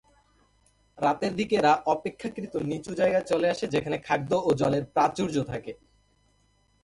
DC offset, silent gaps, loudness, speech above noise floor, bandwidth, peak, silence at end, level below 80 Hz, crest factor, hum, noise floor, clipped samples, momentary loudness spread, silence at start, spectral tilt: under 0.1%; none; -27 LUFS; 40 dB; 11.5 kHz; -10 dBFS; 1.1 s; -60 dBFS; 18 dB; none; -66 dBFS; under 0.1%; 11 LU; 0.95 s; -6 dB/octave